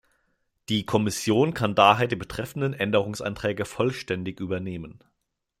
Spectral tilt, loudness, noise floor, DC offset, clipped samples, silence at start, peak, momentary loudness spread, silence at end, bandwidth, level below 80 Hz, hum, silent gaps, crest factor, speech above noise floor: -5 dB/octave; -25 LUFS; -79 dBFS; under 0.1%; under 0.1%; 0.7 s; -2 dBFS; 12 LU; 0.65 s; 16 kHz; -56 dBFS; none; none; 24 dB; 54 dB